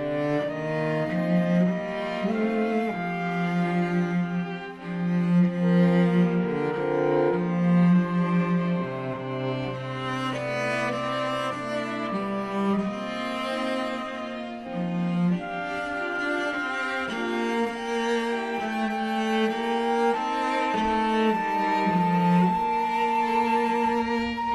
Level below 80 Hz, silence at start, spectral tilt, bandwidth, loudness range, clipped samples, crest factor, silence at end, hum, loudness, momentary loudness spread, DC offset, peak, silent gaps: -58 dBFS; 0 s; -7 dB/octave; 11 kHz; 5 LU; under 0.1%; 14 dB; 0 s; none; -26 LUFS; 8 LU; under 0.1%; -10 dBFS; none